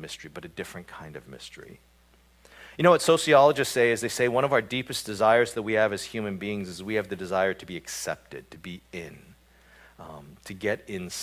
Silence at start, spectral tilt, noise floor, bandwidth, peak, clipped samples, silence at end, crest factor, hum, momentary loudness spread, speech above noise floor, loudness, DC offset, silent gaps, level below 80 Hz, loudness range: 0 s; -4 dB/octave; -59 dBFS; 16 kHz; -4 dBFS; under 0.1%; 0 s; 24 dB; none; 23 LU; 33 dB; -25 LUFS; under 0.1%; none; -60 dBFS; 13 LU